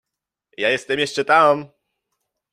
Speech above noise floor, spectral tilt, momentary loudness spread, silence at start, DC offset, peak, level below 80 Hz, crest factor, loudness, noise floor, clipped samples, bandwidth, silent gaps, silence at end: 65 dB; -3.5 dB/octave; 8 LU; 0.6 s; under 0.1%; -2 dBFS; -68 dBFS; 20 dB; -18 LUFS; -83 dBFS; under 0.1%; 13.5 kHz; none; 0.85 s